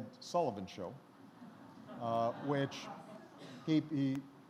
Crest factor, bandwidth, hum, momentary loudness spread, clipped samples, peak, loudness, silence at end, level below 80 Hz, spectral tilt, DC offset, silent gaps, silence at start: 18 dB; 13 kHz; none; 20 LU; under 0.1%; -22 dBFS; -38 LUFS; 0 s; -82 dBFS; -6.5 dB/octave; under 0.1%; none; 0 s